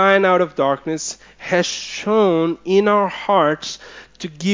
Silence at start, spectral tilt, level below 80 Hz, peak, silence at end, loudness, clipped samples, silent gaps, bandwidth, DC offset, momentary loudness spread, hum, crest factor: 0 s; -4.5 dB/octave; -58 dBFS; 0 dBFS; 0 s; -18 LUFS; under 0.1%; none; 7.6 kHz; under 0.1%; 14 LU; none; 18 dB